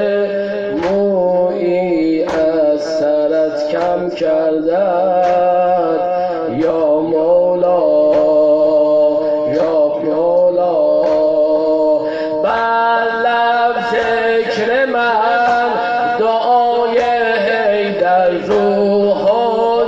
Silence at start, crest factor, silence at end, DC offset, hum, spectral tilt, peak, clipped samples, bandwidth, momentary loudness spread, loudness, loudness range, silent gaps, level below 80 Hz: 0 s; 10 dB; 0 s; under 0.1%; none; -6 dB/octave; -2 dBFS; under 0.1%; 7.6 kHz; 4 LU; -14 LUFS; 2 LU; none; -50 dBFS